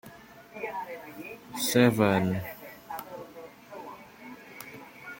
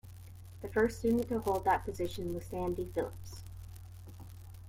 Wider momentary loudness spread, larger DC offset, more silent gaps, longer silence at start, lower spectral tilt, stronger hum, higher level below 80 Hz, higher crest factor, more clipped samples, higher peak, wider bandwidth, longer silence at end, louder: first, 24 LU vs 20 LU; neither; neither; about the same, 0.05 s vs 0.05 s; second, -5 dB/octave vs -6.5 dB/octave; neither; second, -66 dBFS vs -52 dBFS; first, 24 dB vs 18 dB; neither; first, -8 dBFS vs -16 dBFS; about the same, 17 kHz vs 16.5 kHz; about the same, 0 s vs 0 s; first, -28 LUFS vs -34 LUFS